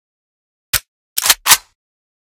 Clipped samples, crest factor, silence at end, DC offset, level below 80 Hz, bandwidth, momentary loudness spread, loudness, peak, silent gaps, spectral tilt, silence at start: 0.3%; 20 dB; 0.7 s; under 0.1%; -46 dBFS; over 20 kHz; 10 LU; -14 LUFS; 0 dBFS; 0.88-1.16 s; 2 dB/octave; 0.75 s